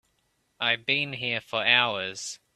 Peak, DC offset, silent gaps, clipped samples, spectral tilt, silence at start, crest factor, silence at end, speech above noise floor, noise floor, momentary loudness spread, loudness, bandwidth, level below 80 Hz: -6 dBFS; under 0.1%; none; under 0.1%; -2 dB/octave; 0.6 s; 24 dB; 0.2 s; 45 dB; -72 dBFS; 11 LU; -25 LUFS; 14 kHz; -72 dBFS